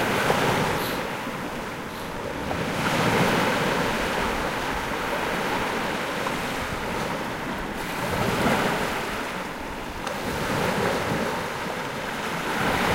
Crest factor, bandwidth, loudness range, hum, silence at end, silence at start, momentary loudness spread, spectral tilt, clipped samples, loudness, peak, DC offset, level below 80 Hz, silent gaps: 18 dB; 16 kHz; 3 LU; none; 0 s; 0 s; 9 LU; -4.5 dB/octave; under 0.1%; -26 LUFS; -8 dBFS; under 0.1%; -44 dBFS; none